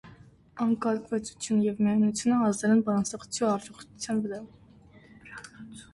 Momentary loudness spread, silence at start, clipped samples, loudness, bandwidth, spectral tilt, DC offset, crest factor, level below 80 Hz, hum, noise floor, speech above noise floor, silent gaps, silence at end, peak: 20 LU; 0.05 s; under 0.1%; -27 LUFS; 11.5 kHz; -5.5 dB/octave; under 0.1%; 14 dB; -64 dBFS; none; -54 dBFS; 28 dB; none; 0.1 s; -14 dBFS